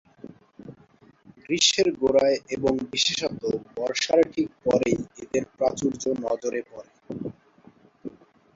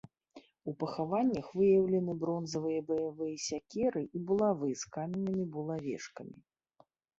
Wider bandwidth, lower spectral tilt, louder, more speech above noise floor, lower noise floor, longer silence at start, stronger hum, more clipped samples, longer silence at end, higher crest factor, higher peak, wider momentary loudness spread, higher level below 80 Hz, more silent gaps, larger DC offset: about the same, 8 kHz vs 8 kHz; second, -3 dB/octave vs -6 dB/octave; first, -24 LUFS vs -34 LUFS; second, 32 dB vs 36 dB; second, -56 dBFS vs -69 dBFS; about the same, 0.25 s vs 0.35 s; neither; neither; second, 0.45 s vs 0.85 s; about the same, 20 dB vs 16 dB; first, -6 dBFS vs -18 dBFS; first, 18 LU vs 13 LU; first, -58 dBFS vs -70 dBFS; neither; neither